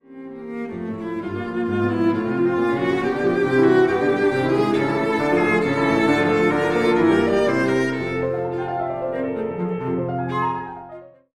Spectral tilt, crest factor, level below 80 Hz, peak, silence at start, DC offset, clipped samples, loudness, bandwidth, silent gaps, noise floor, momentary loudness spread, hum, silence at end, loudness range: -7 dB/octave; 14 dB; -50 dBFS; -6 dBFS; 0.1 s; under 0.1%; under 0.1%; -20 LUFS; 11 kHz; none; -41 dBFS; 12 LU; none; 0.25 s; 5 LU